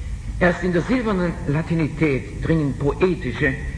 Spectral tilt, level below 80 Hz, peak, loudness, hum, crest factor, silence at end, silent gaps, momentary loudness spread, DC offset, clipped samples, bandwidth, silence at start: -7.5 dB/octave; -32 dBFS; -4 dBFS; -21 LUFS; none; 18 dB; 0 s; none; 3 LU; under 0.1%; under 0.1%; 10.5 kHz; 0 s